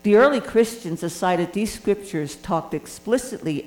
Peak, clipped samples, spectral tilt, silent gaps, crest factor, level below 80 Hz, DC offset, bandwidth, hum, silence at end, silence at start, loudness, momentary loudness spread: -6 dBFS; under 0.1%; -5.5 dB/octave; none; 16 dB; -52 dBFS; under 0.1%; 18.5 kHz; none; 0 s; 0.05 s; -23 LUFS; 12 LU